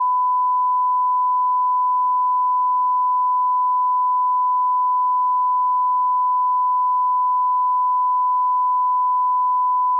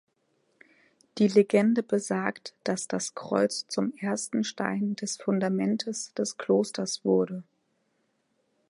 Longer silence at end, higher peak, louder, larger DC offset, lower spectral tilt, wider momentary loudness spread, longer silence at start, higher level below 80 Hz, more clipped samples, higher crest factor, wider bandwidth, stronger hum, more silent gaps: second, 0 s vs 1.25 s; second, -14 dBFS vs -8 dBFS; first, -18 LUFS vs -28 LUFS; neither; second, 8.5 dB/octave vs -5 dB/octave; second, 0 LU vs 9 LU; second, 0 s vs 1.15 s; second, under -90 dBFS vs -76 dBFS; neither; second, 4 dB vs 20 dB; second, 1.1 kHz vs 11.5 kHz; neither; neither